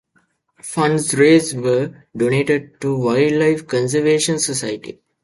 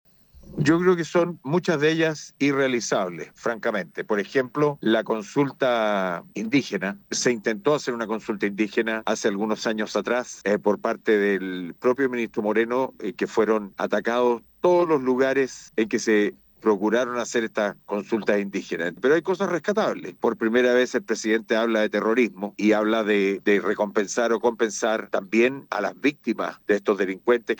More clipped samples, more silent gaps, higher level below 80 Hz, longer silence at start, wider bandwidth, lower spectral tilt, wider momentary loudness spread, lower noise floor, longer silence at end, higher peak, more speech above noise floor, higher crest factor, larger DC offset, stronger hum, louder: neither; neither; first, -56 dBFS vs -64 dBFS; first, 0.65 s vs 0.45 s; second, 11.5 kHz vs 19 kHz; about the same, -4.5 dB/octave vs -5 dB/octave; first, 13 LU vs 6 LU; first, -63 dBFS vs -48 dBFS; first, 0.3 s vs 0.05 s; first, 0 dBFS vs -8 dBFS; first, 46 dB vs 25 dB; about the same, 16 dB vs 16 dB; neither; neither; first, -17 LUFS vs -24 LUFS